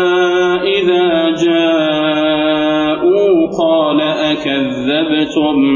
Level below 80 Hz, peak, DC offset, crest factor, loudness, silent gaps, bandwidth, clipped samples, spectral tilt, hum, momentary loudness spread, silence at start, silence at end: -50 dBFS; -2 dBFS; under 0.1%; 10 dB; -13 LUFS; none; 7.4 kHz; under 0.1%; -5.5 dB/octave; none; 3 LU; 0 s; 0 s